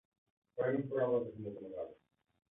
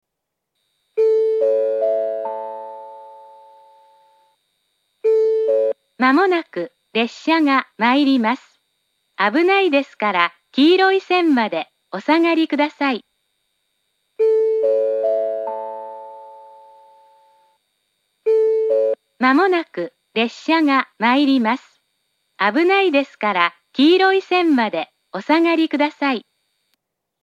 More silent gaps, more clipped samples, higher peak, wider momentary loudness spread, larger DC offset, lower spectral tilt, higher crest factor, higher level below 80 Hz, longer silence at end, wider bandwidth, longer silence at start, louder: neither; neither; second, -22 dBFS vs 0 dBFS; about the same, 13 LU vs 13 LU; neither; about the same, -5 dB/octave vs -5 dB/octave; about the same, 16 dB vs 18 dB; about the same, -76 dBFS vs -80 dBFS; second, 0.55 s vs 1.05 s; second, 3.8 kHz vs 8.6 kHz; second, 0.55 s vs 0.95 s; second, -38 LUFS vs -18 LUFS